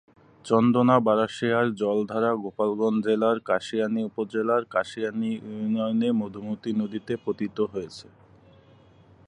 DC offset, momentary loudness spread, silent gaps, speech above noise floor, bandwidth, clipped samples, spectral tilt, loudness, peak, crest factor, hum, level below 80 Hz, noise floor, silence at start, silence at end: under 0.1%; 10 LU; none; 30 dB; 10 kHz; under 0.1%; -7 dB/octave; -25 LUFS; -6 dBFS; 20 dB; none; -66 dBFS; -55 dBFS; 0.45 s; 1.25 s